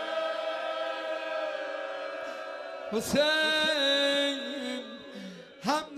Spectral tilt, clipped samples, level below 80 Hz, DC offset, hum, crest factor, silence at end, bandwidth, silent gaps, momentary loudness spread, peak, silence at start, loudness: -2.5 dB/octave; under 0.1%; -68 dBFS; under 0.1%; none; 18 dB; 0 s; 15.5 kHz; none; 15 LU; -14 dBFS; 0 s; -29 LUFS